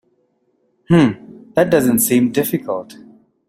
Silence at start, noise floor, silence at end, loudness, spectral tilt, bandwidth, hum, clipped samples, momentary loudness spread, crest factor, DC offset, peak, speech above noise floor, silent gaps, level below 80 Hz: 0.9 s; -63 dBFS; 0.65 s; -16 LUFS; -5.5 dB/octave; 16 kHz; none; under 0.1%; 11 LU; 16 dB; under 0.1%; -2 dBFS; 49 dB; none; -52 dBFS